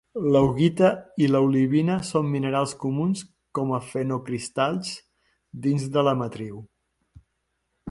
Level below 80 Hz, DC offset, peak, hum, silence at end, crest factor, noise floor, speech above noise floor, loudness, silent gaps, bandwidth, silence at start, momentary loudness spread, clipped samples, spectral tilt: -56 dBFS; under 0.1%; -6 dBFS; none; 0 s; 18 dB; -76 dBFS; 53 dB; -24 LUFS; none; 11.5 kHz; 0.15 s; 14 LU; under 0.1%; -6.5 dB/octave